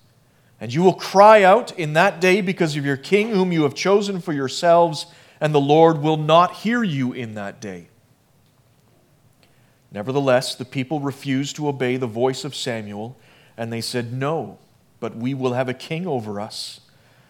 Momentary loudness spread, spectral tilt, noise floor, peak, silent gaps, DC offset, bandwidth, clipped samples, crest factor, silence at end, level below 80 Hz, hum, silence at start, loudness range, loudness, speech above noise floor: 17 LU; -5.5 dB/octave; -58 dBFS; 0 dBFS; none; under 0.1%; 17 kHz; under 0.1%; 20 dB; 0.55 s; -70 dBFS; none; 0.6 s; 11 LU; -19 LUFS; 39 dB